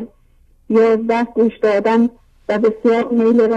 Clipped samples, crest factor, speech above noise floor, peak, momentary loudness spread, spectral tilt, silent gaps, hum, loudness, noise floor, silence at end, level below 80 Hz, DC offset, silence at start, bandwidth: under 0.1%; 12 dB; 37 dB; -2 dBFS; 7 LU; -7 dB/octave; none; none; -16 LUFS; -51 dBFS; 0 s; -52 dBFS; under 0.1%; 0 s; 7.8 kHz